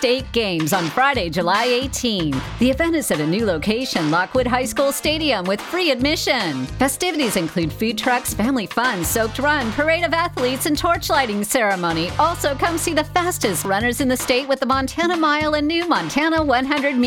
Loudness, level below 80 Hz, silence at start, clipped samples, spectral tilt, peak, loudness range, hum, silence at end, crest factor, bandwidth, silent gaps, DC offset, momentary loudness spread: -19 LUFS; -40 dBFS; 0 s; under 0.1%; -4 dB/octave; -2 dBFS; 1 LU; none; 0 s; 18 dB; 19 kHz; none; under 0.1%; 3 LU